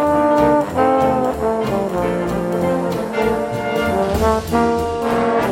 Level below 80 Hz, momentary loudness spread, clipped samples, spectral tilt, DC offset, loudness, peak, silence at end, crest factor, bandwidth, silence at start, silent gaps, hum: -36 dBFS; 5 LU; under 0.1%; -6.5 dB/octave; under 0.1%; -18 LUFS; -2 dBFS; 0 s; 14 dB; 16.5 kHz; 0 s; none; none